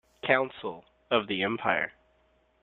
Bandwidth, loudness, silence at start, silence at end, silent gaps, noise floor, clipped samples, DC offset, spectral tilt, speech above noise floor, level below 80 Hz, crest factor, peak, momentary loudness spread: 4.4 kHz; -29 LUFS; 0.25 s; 0.7 s; none; -67 dBFS; under 0.1%; under 0.1%; -7 dB/octave; 39 dB; -68 dBFS; 24 dB; -6 dBFS; 13 LU